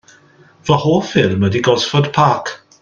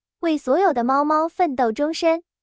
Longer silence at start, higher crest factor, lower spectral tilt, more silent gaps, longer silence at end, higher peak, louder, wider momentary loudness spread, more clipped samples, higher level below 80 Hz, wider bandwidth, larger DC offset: first, 0.65 s vs 0.25 s; about the same, 16 dB vs 12 dB; about the same, -5.5 dB/octave vs -4.5 dB/octave; neither; about the same, 0.25 s vs 0.2 s; first, 0 dBFS vs -8 dBFS; first, -15 LUFS vs -20 LUFS; first, 7 LU vs 3 LU; neither; first, -50 dBFS vs -62 dBFS; about the same, 7.4 kHz vs 8 kHz; neither